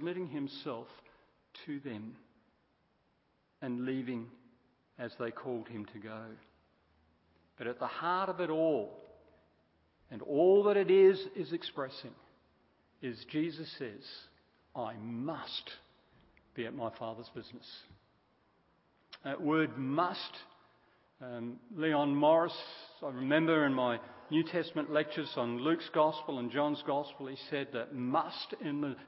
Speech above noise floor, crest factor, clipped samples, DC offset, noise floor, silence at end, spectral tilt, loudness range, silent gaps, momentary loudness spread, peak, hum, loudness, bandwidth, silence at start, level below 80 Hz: 41 dB; 22 dB; under 0.1%; under 0.1%; -75 dBFS; 0 s; -4 dB/octave; 14 LU; none; 20 LU; -14 dBFS; none; -34 LUFS; 5.6 kHz; 0 s; -78 dBFS